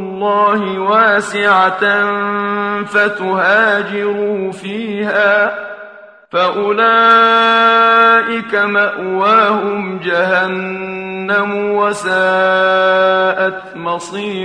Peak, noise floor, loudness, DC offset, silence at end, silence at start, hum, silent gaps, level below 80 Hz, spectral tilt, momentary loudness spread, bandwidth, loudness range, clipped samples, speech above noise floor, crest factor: 0 dBFS; -37 dBFS; -13 LUFS; under 0.1%; 0 s; 0 s; none; none; -60 dBFS; -4.5 dB/octave; 12 LU; 10.5 kHz; 5 LU; under 0.1%; 24 dB; 14 dB